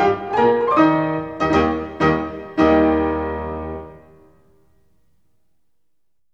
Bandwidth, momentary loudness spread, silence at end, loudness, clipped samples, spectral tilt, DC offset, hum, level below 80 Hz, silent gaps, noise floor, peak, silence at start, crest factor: 7.2 kHz; 12 LU; 2.35 s; -18 LUFS; under 0.1%; -7.5 dB/octave; 0.2%; none; -40 dBFS; none; -78 dBFS; -2 dBFS; 0 s; 18 dB